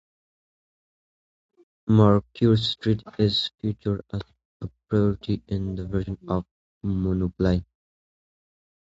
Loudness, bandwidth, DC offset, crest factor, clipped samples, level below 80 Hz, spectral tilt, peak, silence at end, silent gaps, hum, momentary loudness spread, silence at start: -24 LUFS; 7.8 kHz; under 0.1%; 22 dB; under 0.1%; -44 dBFS; -8 dB/octave; -4 dBFS; 1.2 s; 4.45-4.60 s, 6.51-6.81 s; none; 15 LU; 1.85 s